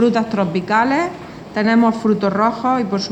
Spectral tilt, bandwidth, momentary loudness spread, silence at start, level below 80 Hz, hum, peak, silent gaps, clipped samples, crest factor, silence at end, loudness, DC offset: -6.5 dB/octave; 8.4 kHz; 7 LU; 0 s; -54 dBFS; none; -2 dBFS; none; under 0.1%; 14 dB; 0 s; -17 LUFS; under 0.1%